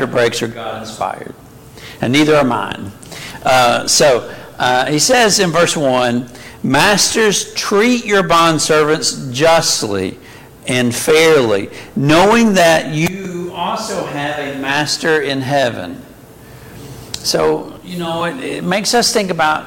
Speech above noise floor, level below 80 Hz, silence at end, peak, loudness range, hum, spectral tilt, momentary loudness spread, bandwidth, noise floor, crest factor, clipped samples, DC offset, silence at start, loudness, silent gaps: 24 dB; -46 dBFS; 0 s; -2 dBFS; 6 LU; none; -3.5 dB/octave; 15 LU; 17 kHz; -38 dBFS; 14 dB; under 0.1%; under 0.1%; 0 s; -14 LUFS; none